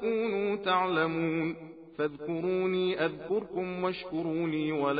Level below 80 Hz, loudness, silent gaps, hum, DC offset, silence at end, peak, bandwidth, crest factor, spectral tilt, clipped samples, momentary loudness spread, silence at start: -66 dBFS; -31 LUFS; none; none; under 0.1%; 0 s; -14 dBFS; 5 kHz; 16 dB; -4.5 dB/octave; under 0.1%; 7 LU; 0 s